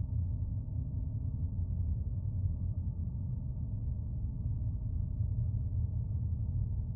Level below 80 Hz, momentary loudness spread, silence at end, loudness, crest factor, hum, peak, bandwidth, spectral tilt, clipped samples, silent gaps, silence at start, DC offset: -40 dBFS; 3 LU; 0 s; -37 LUFS; 12 dB; none; -22 dBFS; 1.3 kHz; -14.5 dB/octave; under 0.1%; none; 0 s; under 0.1%